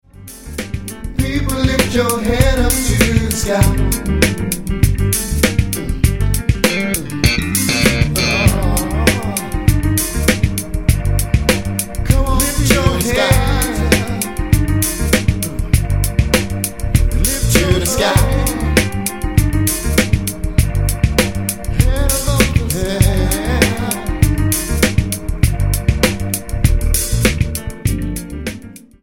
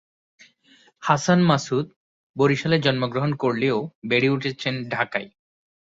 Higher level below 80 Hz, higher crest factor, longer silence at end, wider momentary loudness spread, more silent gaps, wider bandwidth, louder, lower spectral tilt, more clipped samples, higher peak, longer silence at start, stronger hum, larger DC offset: first, -20 dBFS vs -60 dBFS; second, 14 dB vs 20 dB; second, 0.25 s vs 0.65 s; second, 7 LU vs 11 LU; second, none vs 1.96-2.34 s, 3.95-4.02 s; first, 17.5 kHz vs 8 kHz; first, -16 LUFS vs -22 LUFS; about the same, -4.5 dB/octave vs -5.5 dB/octave; neither; about the same, 0 dBFS vs -2 dBFS; second, 0.15 s vs 1 s; neither; neither